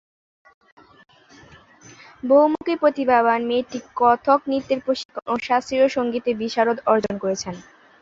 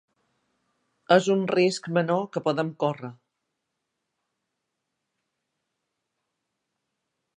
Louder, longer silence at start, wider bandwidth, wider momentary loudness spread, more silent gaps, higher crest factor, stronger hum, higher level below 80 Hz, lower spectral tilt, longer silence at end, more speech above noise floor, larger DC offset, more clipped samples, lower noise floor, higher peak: first, -20 LUFS vs -24 LUFS; first, 2.25 s vs 1.1 s; second, 7.8 kHz vs 10 kHz; about the same, 10 LU vs 8 LU; first, 5.05-5.09 s vs none; second, 18 dB vs 24 dB; neither; first, -60 dBFS vs -78 dBFS; about the same, -4.5 dB/octave vs -5.5 dB/octave; second, 0.4 s vs 4.25 s; second, 29 dB vs 58 dB; neither; neither; second, -49 dBFS vs -82 dBFS; about the same, -2 dBFS vs -4 dBFS